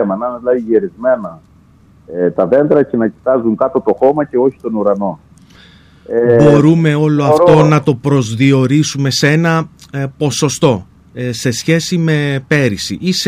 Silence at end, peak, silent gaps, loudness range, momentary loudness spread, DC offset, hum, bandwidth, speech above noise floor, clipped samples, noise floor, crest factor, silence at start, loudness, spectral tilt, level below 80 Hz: 0 s; 0 dBFS; none; 5 LU; 10 LU; under 0.1%; none; 15 kHz; 33 dB; under 0.1%; -45 dBFS; 12 dB; 0 s; -13 LUFS; -6 dB/octave; -46 dBFS